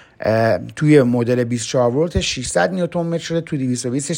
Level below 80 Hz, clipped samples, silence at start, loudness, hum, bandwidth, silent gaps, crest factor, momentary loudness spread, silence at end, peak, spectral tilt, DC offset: -40 dBFS; under 0.1%; 0.2 s; -18 LUFS; none; 16.5 kHz; none; 18 dB; 8 LU; 0 s; 0 dBFS; -5.5 dB/octave; under 0.1%